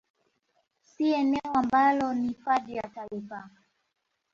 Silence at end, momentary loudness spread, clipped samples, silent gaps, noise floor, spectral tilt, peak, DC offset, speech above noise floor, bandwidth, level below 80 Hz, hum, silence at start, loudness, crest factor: 0.85 s; 16 LU; under 0.1%; none; -79 dBFS; -6 dB/octave; -12 dBFS; under 0.1%; 52 dB; 7.6 kHz; -66 dBFS; none; 1 s; -27 LUFS; 18 dB